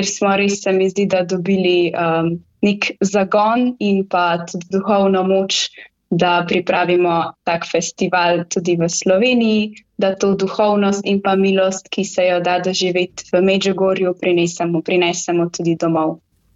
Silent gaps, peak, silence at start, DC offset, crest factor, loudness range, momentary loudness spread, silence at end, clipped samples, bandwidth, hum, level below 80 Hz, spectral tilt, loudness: none; -2 dBFS; 0 s; under 0.1%; 14 dB; 1 LU; 6 LU; 0.4 s; under 0.1%; 8 kHz; none; -58 dBFS; -4.5 dB/octave; -17 LUFS